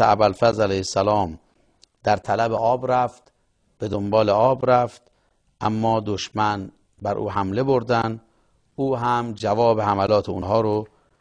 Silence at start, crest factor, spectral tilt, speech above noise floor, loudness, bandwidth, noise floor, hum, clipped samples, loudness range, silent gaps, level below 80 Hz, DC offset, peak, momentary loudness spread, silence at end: 0 s; 18 dB; -6 dB/octave; 45 dB; -22 LUFS; 10.5 kHz; -66 dBFS; none; under 0.1%; 3 LU; none; -52 dBFS; under 0.1%; -4 dBFS; 10 LU; 0.35 s